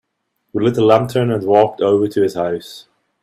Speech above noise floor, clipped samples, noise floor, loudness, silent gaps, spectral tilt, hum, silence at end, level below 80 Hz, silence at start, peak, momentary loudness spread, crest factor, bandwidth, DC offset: 56 dB; under 0.1%; -71 dBFS; -15 LUFS; none; -7 dB/octave; none; 0.45 s; -56 dBFS; 0.55 s; 0 dBFS; 12 LU; 16 dB; 15 kHz; under 0.1%